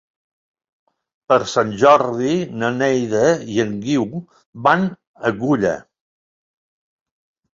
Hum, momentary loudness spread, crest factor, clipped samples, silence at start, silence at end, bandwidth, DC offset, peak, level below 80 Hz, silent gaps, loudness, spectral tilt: none; 10 LU; 18 dB; under 0.1%; 1.3 s; 1.75 s; 7.8 kHz; under 0.1%; -2 dBFS; -58 dBFS; 4.46-4.53 s, 5.07-5.14 s; -18 LUFS; -5.5 dB/octave